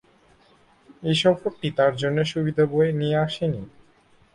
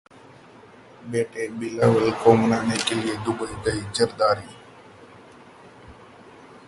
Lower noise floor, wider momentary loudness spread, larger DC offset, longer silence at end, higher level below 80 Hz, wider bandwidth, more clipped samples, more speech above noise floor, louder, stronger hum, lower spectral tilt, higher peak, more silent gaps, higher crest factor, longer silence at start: first, -58 dBFS vs -48 dBFS; second, 8 LU vs 12 LU; neither; first, 0.65 s vs 0.1 s; about the same, -56 dBFS vs -52 dBFS; about the same, 11 kHz vs 11.5 kHz; neither; first, 35 dB vs 26 dB; about the same, -23 LUFS vs -22 LUFS; neither; first, -6.5 dB/octave vs -5 dB/octave; second, -6 dBFS vs -2 dBFS; neither; second, 18 dB vs 24 dB; about the same, 0.9 s vs 1 s